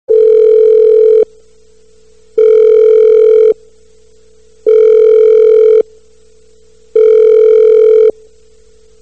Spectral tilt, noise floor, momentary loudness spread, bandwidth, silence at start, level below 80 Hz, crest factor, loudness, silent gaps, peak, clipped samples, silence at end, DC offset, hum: -5 dB/octave; -47 dBFS; 6 LU; 4.1 kHz; 0.1 s; -54 dBFS; 8 dB; -7 LUFS; none; 0 dBFS; under 0.1%; 0.9 s; 0.7%; 60 Hz at -55 dBFS